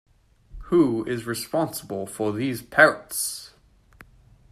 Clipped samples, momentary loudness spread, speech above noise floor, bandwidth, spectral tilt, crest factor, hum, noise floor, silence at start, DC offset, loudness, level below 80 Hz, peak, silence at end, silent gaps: under 0.1%; 12 LU; 30 dB; 15 kHz; -4 dB/octave; 24 dB; none; -53 dBFS; 0.55 s; under 0.1%; -23 LUFS; -52 dBFS; -2 dBFS; 0.5 s; none